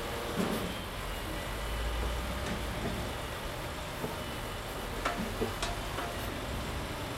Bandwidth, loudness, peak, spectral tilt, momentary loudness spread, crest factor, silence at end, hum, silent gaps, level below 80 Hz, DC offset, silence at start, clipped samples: 16 kHz; -36 LUFS; -18 dBFS; -4.5 dB/octave; 4 LU; 18 dB; 0 s; none; none; -42 dBFS; under 0.1%; 0 s; under 0.1%